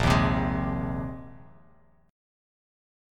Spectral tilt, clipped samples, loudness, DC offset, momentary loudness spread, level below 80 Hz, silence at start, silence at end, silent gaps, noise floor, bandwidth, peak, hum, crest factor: -6.5 dB/octave; under 0.1%; -28 LUFS; under 0.1%; 19 LU; -38 dBFS; 0 s; 1 s; none; -60 dBFS; 15 kHz; -8 dBFS; none; 22 dB